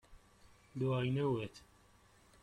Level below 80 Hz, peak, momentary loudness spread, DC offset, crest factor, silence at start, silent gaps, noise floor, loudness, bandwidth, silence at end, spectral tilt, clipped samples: -66 dBFS; -24 dBFS; 16 LU; under 0.1%; 16 dB; 0.1 s; none; -66 dBFS; -37 LUFS; 10 kHz; 0.85 s; -8 dB/octave; under 0.1%